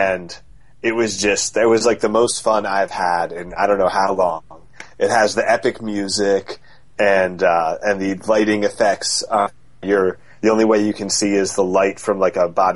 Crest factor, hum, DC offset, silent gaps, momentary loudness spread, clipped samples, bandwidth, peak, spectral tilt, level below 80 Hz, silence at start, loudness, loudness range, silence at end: 16 dB; none; 0.7%; none; 7 LU; under 0.1%; 11.5 kHz; -2 dBFS; -3.5 dB/octave; -52 dBFS; 0 s; -18 LUFS; 1 LU; 0 s